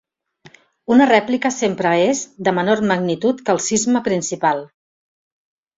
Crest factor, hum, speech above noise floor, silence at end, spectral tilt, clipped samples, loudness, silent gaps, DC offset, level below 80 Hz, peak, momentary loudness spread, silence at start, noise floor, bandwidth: 16 dB; none; 33 dB; 1.1 s; -4 dB/octave; under 0.1%; -17 LUFS; none; under 0.1%; -60 dBFS; -2 dBFS; 6 LU; 0.9 s; -50 dBFS; 7.8 kHz